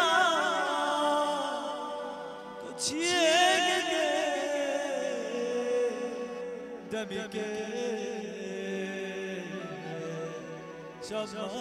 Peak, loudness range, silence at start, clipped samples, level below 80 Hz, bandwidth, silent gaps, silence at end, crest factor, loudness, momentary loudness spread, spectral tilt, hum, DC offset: -12 dBFS; 9 LU; 0 s; under 0.1%; -72 dBFS; 15.5 kHz; none; 0 s; 20 dB; -30 LUFS; 15 LU; -2.5 dB/octave; none; under 0.1%